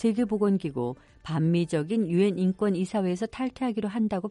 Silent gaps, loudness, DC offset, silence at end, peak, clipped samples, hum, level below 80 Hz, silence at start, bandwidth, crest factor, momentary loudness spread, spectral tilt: none; -27 LUFS; under 0.1%; 0 s; -12 dBFS; under 0.1%; none; -58 dBFS; 0 s; 11.5 kHz; 14 dB; 7 LU; -7.5 dB/octave